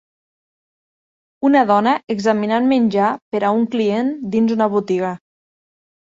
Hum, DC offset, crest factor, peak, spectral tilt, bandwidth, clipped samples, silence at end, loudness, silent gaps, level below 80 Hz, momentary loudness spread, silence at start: none; under 0.1%; 16 dB; -2 dBFS; -6.5 dB/octave; 7.8 kHz; under 0.1%; 0.95 s; -17 LUFS; 3.22-3.31 s; -62 dBFS; 6 LU; 1.4 s